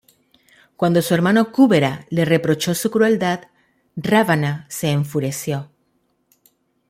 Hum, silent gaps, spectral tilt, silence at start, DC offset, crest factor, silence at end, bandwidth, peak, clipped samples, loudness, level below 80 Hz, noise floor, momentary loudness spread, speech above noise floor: none; none; -5.5 dB/octave; 0.8 s; under 0.1%; 16 dB; 1.25 s; 16.5 kHz; -2 dBFS; under 0.1%; -18 LUFS; -58 dBFS; -66 dBFS; 11 LU; 48 dB